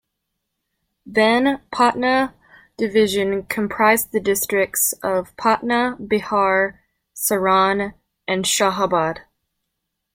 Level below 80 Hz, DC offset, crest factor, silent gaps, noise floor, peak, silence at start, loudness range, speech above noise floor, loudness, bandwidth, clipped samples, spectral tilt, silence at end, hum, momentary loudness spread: -54 dBFS; under 0.1%; 18 dB; none; -77 dBFS; -2 dBFS; 1.05 s; 2 LU; 59 dB; -19 LUFS; 16.5 kHz; under 0.1%; -3 dB/octave; 0.95 s; none; 8 LU